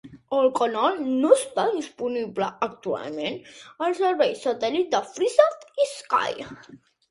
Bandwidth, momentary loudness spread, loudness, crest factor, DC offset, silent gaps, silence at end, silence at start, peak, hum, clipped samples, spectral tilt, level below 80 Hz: 11.5 kHz; 11 LU; -24 LUFS; 22 dB; under 0.1%; none; 0.35 s; 0.05 s; -2 dBFS; none; under 0.1%; -3.5 dB/octave; -68 dBFS